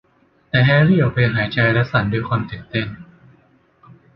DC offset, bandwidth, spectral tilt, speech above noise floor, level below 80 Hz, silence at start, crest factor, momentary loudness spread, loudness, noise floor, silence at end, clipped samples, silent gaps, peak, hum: under 0.1%; 5.8 kHz; -9.5 dB/octave; 41 dB; -46 dBFS; 0.55 s; 16 dB; 11 LU; -17 LUFS; -57 dBFS; 1.15 s; under 0.1%; none; -2 dBFS; none